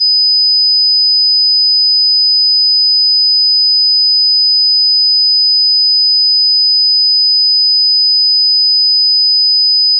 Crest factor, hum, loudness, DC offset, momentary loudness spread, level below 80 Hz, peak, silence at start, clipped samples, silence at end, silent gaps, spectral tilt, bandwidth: 4 dB; none; -6 LUFS; under 0.1%; 0 LU; under -90 dBFS; -6 dBFS; 0 s; under 0.1%; 0 s; none; 13.5 dB/octave; 5.4 kHz